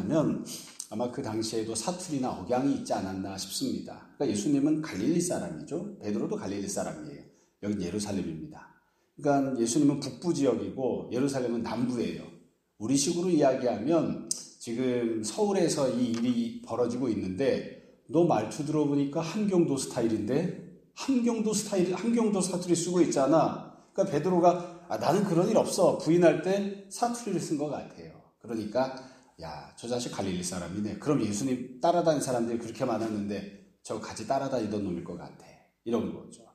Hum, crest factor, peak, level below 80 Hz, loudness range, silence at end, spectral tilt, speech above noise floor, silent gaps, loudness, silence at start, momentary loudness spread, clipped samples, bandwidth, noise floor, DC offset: none; 20 dB; -10 dBFS; -66 dBFS; 7 LU; 0.15 s; -5.5 dB/octave; 36 dB; none; -29 LUFS; 0 s; 13 LU; under 0.1%; 15 kHz; -64 dBFS; under 0.1%